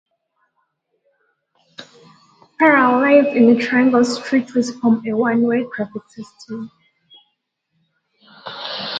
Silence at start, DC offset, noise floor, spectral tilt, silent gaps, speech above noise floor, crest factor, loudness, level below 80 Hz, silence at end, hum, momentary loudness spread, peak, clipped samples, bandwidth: 1.8 s; under 0.1%; -72 dBFS; -5 dB/octave; none; 56 dB; 18 dB; -16 LUFS; -68 dBFS; 0 s; none; 22 LU; 0 dBFS; under 0.1%; 9 kHz